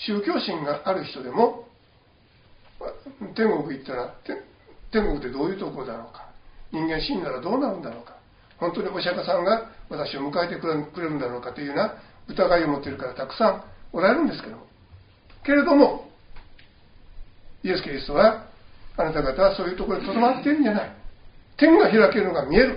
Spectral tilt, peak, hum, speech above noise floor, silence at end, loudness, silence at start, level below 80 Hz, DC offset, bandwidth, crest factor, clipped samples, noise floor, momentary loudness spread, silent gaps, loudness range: -4 dB/octave; -2 dBFS; none; 35 dB; 0 s; -23 LUFS; 0 s; -44 dBFS; under 0.1%; 5.4 kHz; 22 dB; under 0.1%; -58 dBFS; 18 LU; none; 7 LU